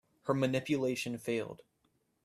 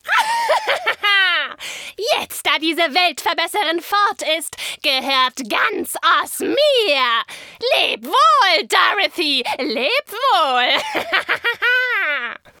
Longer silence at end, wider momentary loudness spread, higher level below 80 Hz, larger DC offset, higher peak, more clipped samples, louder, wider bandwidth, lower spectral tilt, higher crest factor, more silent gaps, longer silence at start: first, 0.7 s vs 0.25 s; first, 10 LU vs 7 LU; about the same, -72 dBFS vs -68 dBFS; neither; second, -16 dBFS vs 0 dBFS; neither; second, -34 LUFS vs -17 LUFS; second, 15 kHz vs over 20 kHz; first, -5.5 dB/octave vs -0.5 dB/octave; about the same, 20 dB vs 18 dB; neither; first, 0.25 s vs 0.05 s